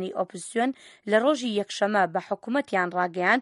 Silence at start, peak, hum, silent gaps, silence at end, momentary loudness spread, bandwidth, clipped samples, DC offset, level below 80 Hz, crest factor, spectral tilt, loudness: 0 s; -8 dBFS; none; none; 0 s; 8 LU; 11.5 kHz; under 0.1%; under 0.1%; -76 dBFS; 18 dB; -4.5 dB/octave; -26 LUFS